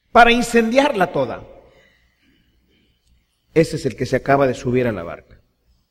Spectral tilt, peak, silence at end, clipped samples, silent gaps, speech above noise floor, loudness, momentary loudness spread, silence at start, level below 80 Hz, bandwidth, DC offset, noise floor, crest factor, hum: -5.5 dB/octave; 0 dBFS; 0.75 s; under 0.1%; none; 44 dB; -17 LUFS; 16 LU; 0.15 s; -40 dBFS; 15 kHz; under 0.1%; -61 dBFS; 20 dB; none